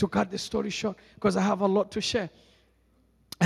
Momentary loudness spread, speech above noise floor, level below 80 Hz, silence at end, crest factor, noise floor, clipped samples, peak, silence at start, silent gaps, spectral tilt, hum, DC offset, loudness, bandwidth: 9 LU; 37 dB; -58 dBFS; 0 s; 22 dB; -65 dBFS; under 0.1%; -6 dBFS; 0 s; none; -5 dB/octave; none; under 0.1%; -28 LUFS; 13 kHz